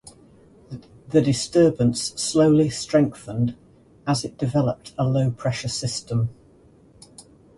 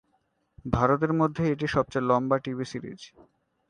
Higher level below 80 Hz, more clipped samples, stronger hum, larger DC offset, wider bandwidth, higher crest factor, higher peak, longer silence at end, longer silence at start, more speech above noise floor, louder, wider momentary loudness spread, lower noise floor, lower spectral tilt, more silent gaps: about the same, -52 dBFS vs -50 dBFS; neither; neither; neither; first, 11.5 kHz vs 10 kHz; second, 16 dB vs 22 dB; about the same, -6 dBFS vs -6 dBFS; second, 0.35 s vs 0.6 s; about the same, 0.7 s vs 0.65 s; second, 32 dB vs 46 dB; first, -22 LUFS vs -26 LUFS; second, 10 LU vs 16 LU; second, -53 dBFS vs -72 dBFS; second, -6 dB/octave vs -7.5 dB/octave; neither